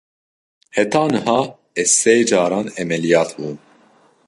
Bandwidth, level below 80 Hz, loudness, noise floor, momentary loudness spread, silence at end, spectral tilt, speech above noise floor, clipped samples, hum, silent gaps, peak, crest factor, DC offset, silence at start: 11.5 kHz; -60 dBFS; -17 LUFS; -54 dBFS; 12 LU; 0.7 s; -3.5 dB/octave; 37 dB; under 0.1%; none; none; -2 dBFS; 18 dB; under 0.1%; 0.75 s